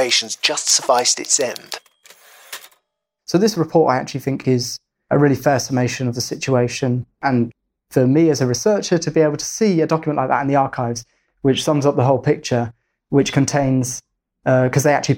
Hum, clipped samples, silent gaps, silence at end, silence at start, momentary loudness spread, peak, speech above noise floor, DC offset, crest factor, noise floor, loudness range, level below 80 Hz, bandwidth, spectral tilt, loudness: none; under 0.1%; none; 0 s; 0 s; 11 LU; -2 dBFS; 54 dB; under 0.1%; 16 dB; -71 dBFS; 2 LU; -54 dBFS; 17 kHz; -4.5 dB/octave; -18 LUFS